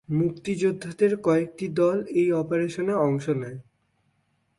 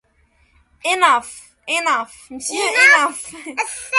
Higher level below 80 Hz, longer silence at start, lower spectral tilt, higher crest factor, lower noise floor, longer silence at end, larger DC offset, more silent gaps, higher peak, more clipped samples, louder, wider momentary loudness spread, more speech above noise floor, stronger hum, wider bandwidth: about the same, -64 dBFS vs -60 dBFS; second, 0.1 s vs 0.85 s; first, -7.5 dB/octave vs 0.5 dB/octave; about the same, 16 dB vs 18 dB; first, -70 dBFS vs -59 dBFS; first, 0.95 s vs 0 s; neither; neither; second, -10 dBFS vs 0 dBFS; neither; second, -25 LUFS vs -16 LUFS; second, 6 LU vs 20 LU; first, 46 dB vs 41 dB; neither; about the same, 11.5 kHz vs 12 kHz